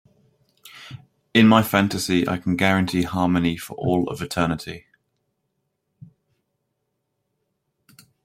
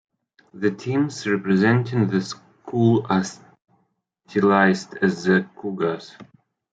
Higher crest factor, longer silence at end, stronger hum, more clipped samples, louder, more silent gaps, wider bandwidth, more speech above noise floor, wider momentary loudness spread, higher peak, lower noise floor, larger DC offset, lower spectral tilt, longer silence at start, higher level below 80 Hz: about the same, 22 dB vs 20 dB; first, 3.45 s vs 0.5 s; neither; neither; about the same, -21 LUFS vs -21 LUFS; neither; first, 16 kHz vs 8.8 kHz; first, 56 dB vs 49 dB; first, 24 LU vs 13 LU; about the same, -2 dBFS vs -2 dBFS; first, -76 dBFS vs -70 dBFS; neither; about the same, -5.5 dB/octave vs -6.5 dB/octave; about the same, 0.65 s vs 0.55 s; first, -54 dBFS vs -66 dBFS